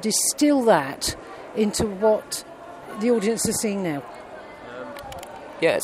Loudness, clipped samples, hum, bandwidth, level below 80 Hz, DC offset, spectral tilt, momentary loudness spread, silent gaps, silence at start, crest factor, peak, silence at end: -22 LUFS; under 0.1%; none; 16 kHz; -52 dBFS; under 0.1%; -3.5 dB/octave; 20 LU; none; 0 s; 20 dB; -4 dBFS; 0 s